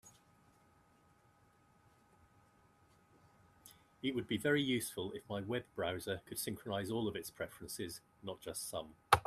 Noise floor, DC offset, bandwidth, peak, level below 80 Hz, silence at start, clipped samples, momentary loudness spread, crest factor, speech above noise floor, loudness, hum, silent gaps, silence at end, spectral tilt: -70 dBFS; under 0.1%; 15 kHz; -10 dBFS; -68 dBFS; 0.05 s; under 0.1%; 14 LU; 32 dB; 29 dB; -40 LUFS; none; none; 0 s; -4 dB/octave